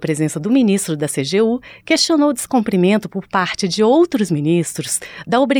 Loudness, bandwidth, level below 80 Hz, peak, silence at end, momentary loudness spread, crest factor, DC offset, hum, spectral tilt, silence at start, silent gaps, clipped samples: -17 LUFS; 19 kHz; -56 dBFS; -2 dBFS; 0 s; 6 LU; 14 dB; under 0.1%; none; -4.5 dB/octave; 0 s; none; under 0.1%